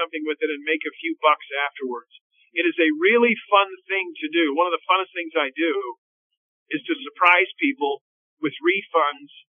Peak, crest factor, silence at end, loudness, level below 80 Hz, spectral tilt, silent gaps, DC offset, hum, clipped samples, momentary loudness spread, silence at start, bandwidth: -2 dBFS; 22 dB; 0.3 s; -22 LUFS; under -90 dBFS; 0 dB/octave; 2.21-2.30 s, 5.98-6.30 s, 6.37-6.66 s, 8.01-8.37 s; under 0.1%; none; under 0.1%; 13 LU; 0 s; 3.7 kHz